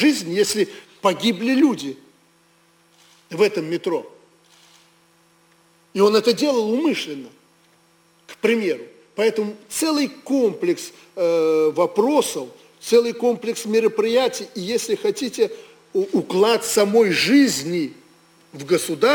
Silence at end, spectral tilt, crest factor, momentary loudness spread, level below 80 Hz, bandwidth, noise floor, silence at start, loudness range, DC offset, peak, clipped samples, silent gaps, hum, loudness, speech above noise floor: 0 s; -4 dB/octave; 16 dB; 13 LU; -68 dBFS; 19.5 kHz; -58 dBFS; 0 s; 5 LU; under 0.1%; -4 dBFS; under 0.1%; none; none; -20 LUFS; 38 dB